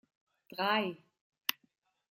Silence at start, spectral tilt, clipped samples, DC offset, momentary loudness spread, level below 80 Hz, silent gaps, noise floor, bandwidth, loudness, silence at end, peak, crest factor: 0.5 s; -3 dB/octave; under 0.1%; under 0.1%; 16 LU; -84 dBFS; 1.21-1.32 s; -76 dBFS; 16 kHz; -34 LUFS; 0.6 s; -8 dBFS; 32 dB